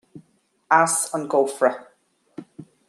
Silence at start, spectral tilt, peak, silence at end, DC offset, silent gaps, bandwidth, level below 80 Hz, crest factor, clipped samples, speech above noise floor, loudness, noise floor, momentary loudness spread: 0.15 s; -3 dB/octave; -2 dBFS; 0.25 s; under 0.1%; none; 13 kHz; -76 dBFS; 22 dB; under 0.1%; 43 dB; -20 LUFS; -63 dBFS; 24 LU